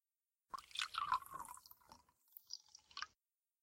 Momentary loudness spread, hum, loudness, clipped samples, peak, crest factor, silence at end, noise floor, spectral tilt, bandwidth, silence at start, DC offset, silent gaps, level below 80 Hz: 21 LU; none; -46 LUFS; under 0.1%; -24 dBFS; 26 dB; 0.55 s; under -90 dBFS; 0.5 dB/octave; 16.5 kHz; 0.55 s; under 0.1%; none; -80 dBFS